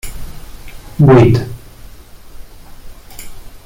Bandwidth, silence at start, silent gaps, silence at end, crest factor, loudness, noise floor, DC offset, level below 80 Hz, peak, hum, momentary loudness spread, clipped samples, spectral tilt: 17 kHz; 0.05 s; none; 0.05 s; 14 dB; -10 LUFS; -35 dBFS; under 0.1%; -32 dBFS; -2 dBFS; none; 29 LU; under 0.1%; -8 dB/octave